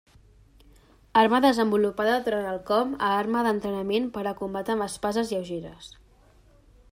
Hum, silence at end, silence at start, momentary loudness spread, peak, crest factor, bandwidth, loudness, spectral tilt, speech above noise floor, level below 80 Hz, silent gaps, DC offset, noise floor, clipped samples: none; 1.05 s; 1.15 s; 11 LU; -6 dBFS; 20 dB; 16 kHz; -25 LUFS; -5 dB/octave; 32 dB; -56 dBFS; none; under 0.1%; -57 dBFS; under 0.1%